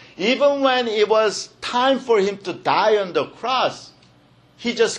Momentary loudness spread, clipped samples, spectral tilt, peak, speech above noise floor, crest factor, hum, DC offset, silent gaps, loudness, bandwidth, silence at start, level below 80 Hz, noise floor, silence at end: 9 LU; under 0.1%; -3.5 dB/octave; -4 dBFS; 34 dB; 16 dB; none; under 0.1%; none; -20 LUFS; 10.5 kHz; 0.2 s; -66 dBFS; -53 dBFS; 0 s